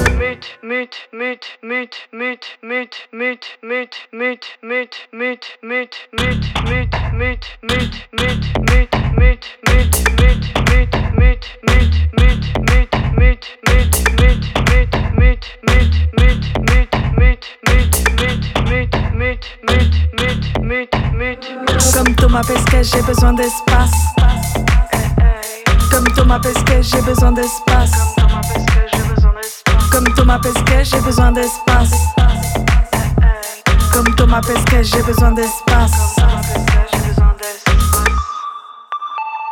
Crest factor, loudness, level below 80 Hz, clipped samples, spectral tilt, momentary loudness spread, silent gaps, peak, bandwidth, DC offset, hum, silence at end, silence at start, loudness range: 12 dB; -15 LUFS; -16 dBFS; under 0.1%; -5 dB/octave; 10 LU; none; 0 dBFS; 18.5 kHz; under 0.1%; none; 0 s; 0 s; 8 LU